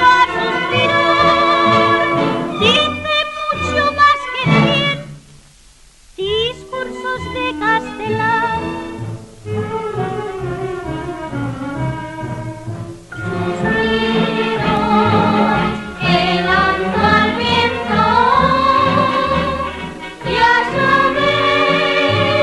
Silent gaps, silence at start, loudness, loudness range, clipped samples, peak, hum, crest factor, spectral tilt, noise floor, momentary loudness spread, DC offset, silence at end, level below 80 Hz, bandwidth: none; 0 s; -15 LUFS; 10 LU; under 0.1%; -2 dBFS; none; 14 dB; -5.5 dB/octave; -45 dBFS; 14 LU; under 0.1%; 0 s; -38 dBFS; 12 kHz